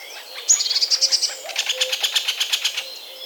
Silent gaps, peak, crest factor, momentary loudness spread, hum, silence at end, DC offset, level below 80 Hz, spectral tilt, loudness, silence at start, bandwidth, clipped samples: none; -4 dBFS; 20 dB; 12 LU; none; 0 s; under 0.1%; under -90 dBFS; 6 dB/octave; -19 LUFS; 0 s; over 20 kHz; under 0.1%